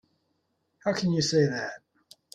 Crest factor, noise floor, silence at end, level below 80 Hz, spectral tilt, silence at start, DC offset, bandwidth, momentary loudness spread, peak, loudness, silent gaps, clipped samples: 18 dB; -75 dBFS; 0.55 s; -68 dBFS; -5 dB/octave; 0.85 s; under 0.1%; 11.5 kHz; 13 LU; -12 dBFS; -27 LUFS; none; under 0.1%